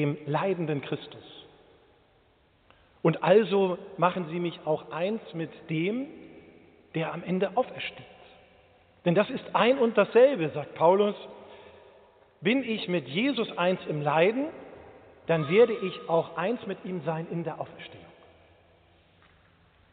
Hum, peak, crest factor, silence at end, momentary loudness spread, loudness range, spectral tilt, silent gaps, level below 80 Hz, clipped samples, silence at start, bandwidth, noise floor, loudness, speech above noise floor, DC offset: none; -8 dBFS; 20 dB; 1.9 s; 17 LU; 8 LU; -4.5 dB/octave; none; -70 dBFS; under 0.1%; 0 s; 4.6 kHz; -64 dBFS; -27 LUFS; 37 dB; under 0.1%